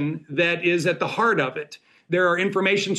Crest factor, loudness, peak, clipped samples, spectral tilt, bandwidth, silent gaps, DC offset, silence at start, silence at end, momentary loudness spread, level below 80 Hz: 14 dB; -22 LUFS; -8 dBFS; under 0.1%; -5 dB/octave; 12.5 kHz; none; under 0.1%; 0 s; 0 s; 7 LU; -70 dBFS